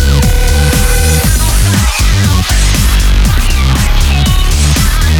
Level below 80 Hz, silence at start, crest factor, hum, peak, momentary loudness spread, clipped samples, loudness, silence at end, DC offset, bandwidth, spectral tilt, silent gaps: -10 dBFS; 0 s; 8 dB; none; 0 dBFS; 1 LU; under 0.1%; -10 LUFS; 0 s; under 0.1%; 19 kHz; -4 dB/octave; none